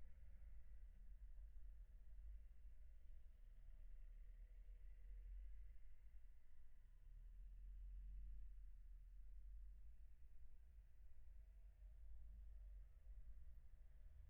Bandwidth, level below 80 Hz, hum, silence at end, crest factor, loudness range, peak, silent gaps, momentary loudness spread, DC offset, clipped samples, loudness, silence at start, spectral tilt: 3.1 kHz; -60 dBFS; none; 0 s; 10 dB; 3 LU; -48 dBFS; none; 7 LU; under 0.1%; under 0.1%; -66 LUFS; 0 s; -8.5 dB/octave